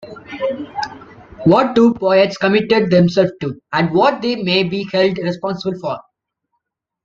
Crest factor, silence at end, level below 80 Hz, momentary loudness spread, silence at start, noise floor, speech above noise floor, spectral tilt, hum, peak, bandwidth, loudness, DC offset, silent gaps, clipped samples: 16 dB; 1.05 s; -54 dBFS; 13 LU; 0 s; -74 dBFS; 59 dB; -7 dB/octave; none; 0 dBFS; 7.4 kHz; -16 LUFS; under 0.1%; none; under 0.1%